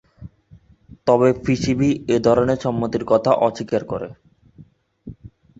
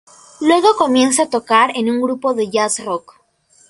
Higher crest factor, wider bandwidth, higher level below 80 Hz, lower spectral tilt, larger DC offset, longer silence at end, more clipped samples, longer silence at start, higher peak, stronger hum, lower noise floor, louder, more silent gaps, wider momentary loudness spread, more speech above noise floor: about the same, 18 dB vs 16 dB; second, 8 kHz vs 11.5 kHz; first, -48 dBFS vs -62 dBFS; first, -7 dB/octave vs -2.5 dB/octave; neither; second, 0.35 s vs 0.7 s; neither; second, 0.2 s vs 0.4 s; about the same, -2 dBFS vs 0 dBFS; neither; second, -50 dBFS vs -54 dBFS; second, -19 LUFS vs -15 LUFS; neither; first, 13 LU vs 7 LU; second, 32 dB vs 39 dB